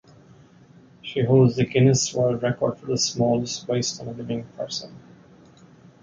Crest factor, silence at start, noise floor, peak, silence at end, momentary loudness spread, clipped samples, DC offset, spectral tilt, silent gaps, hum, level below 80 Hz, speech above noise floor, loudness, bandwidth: 18 dB; 1.05 s; -51 dBFS; -6 dBFS; 1.05 s; 13 LU; under 0.1%; under 0.1%; -5 dB/octave; none; none; -56 dBFS; 29 dB; -23 LUFS; 9.2 kHz